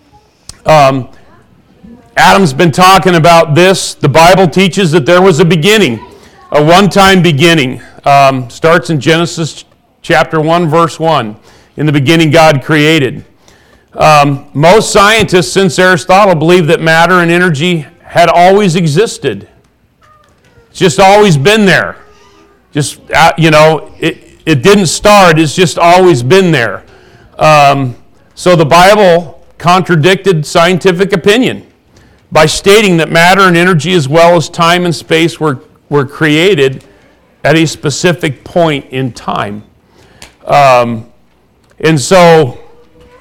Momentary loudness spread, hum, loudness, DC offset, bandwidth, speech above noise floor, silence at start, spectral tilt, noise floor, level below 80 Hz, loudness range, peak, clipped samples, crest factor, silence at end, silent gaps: 11 LU; none; -7 LUFS; under 0.1%; 19 kHz; 42 dB; 0.65 s; -5 dB/octave; -48 dBFS; -38 dBFS; 5 LU; 0 dBFS; 0.4%; 8 dB; 0.6 s; none